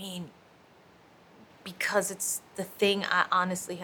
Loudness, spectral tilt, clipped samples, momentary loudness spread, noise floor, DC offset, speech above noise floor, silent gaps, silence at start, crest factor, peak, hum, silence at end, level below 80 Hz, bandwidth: -28 LUFS; -2.5 dB/octave; under 0.1%; 19 LU; -58 dBFS; under 0.1%; 29 dB; none; 0 s; 22 dB; -8 dBFS; none; 0 s; -74 dBFS; over 20 kHz